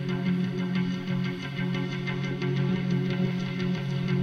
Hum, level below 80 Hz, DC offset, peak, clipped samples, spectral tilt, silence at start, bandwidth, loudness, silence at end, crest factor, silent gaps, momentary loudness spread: none; -60 dBFS; under 0.1%; -16 dBFS; under 0.1%; -7.5 dB/octave; 0 s; 6.8 kHz; -29 LUFS; 0 s; 12 dB; none; 3 LU